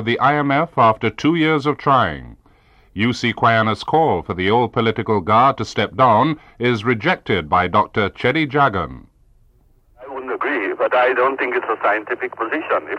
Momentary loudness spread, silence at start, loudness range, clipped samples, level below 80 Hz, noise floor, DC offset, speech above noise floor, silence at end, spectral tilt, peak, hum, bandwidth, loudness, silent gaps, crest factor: 8 LU; 0 s; 3 LU; under 0.1%; -48 dBFS; -54 dBFS; under 0.1%; 36 dB; 0 s; -6.5 dB/octave; -4 dBFS; none; 10 kHz; -18 LUFS; none; 14 dB